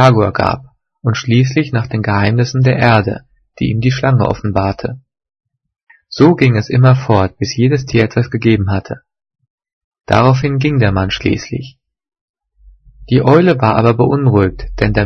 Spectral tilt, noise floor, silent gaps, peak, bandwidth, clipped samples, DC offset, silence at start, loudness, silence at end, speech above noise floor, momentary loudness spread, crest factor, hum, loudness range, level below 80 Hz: -7 dB/octave; -46 dBFS; 9.50-9.58 s, 9.73-9.92 s, 12.21-12.34 s; 0 dBFS; 6.6 kHz; 0.2%; under 0.1%; 0 s; -13 LUFS; 0 s; 34 dB; 11 LU; 14 dB; none; 3 LU; -36 dBFS